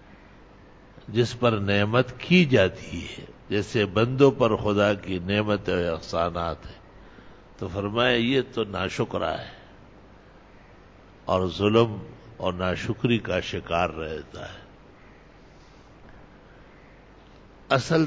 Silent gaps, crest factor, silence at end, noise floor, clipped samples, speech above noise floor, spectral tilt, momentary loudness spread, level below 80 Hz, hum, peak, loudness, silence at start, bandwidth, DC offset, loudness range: none; 20 dB; 0 s; -50 dBFS; under 0.1%; 26 dB; -6.5 dB/octave; 17 LU; -48 dBFS; none; -6 dBFS; -25 LUFS; 0.1 s; 8 kHz; under 0.1%; 8 LU